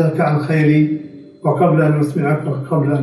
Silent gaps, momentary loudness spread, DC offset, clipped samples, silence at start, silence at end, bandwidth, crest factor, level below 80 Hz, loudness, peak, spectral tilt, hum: none; 8 LU; under 0.1%; under 0.1%; 0 s; 0 s; 11.5 kHz; 14 dB; -60 dBFS; -16 LUFS; -2 dBFS; -9.5 dB/octave; none